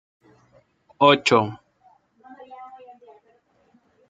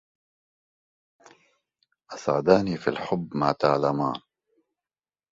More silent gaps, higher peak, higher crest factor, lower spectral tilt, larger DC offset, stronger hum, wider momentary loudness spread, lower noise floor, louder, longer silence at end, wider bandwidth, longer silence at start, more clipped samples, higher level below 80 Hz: neither; about the same, -2 dBFS vs -4 dBFS; about the same, 24 dB vs 24 dB; second, -4.5 dB/octave vs -6.5 dB/octave; neither; neither; first, 27 LU vs 11 LU; second, -62 dBFS vs under -90 dBFS; first, -19 LUFS vs -25 LUFS; first, 1.45 s vs 1.15 s; first, 9.4 kHz vs 7.8 kHz; second, 1 s vs 2.1 s; neither; second, -68 dBFS vs -60 dBFS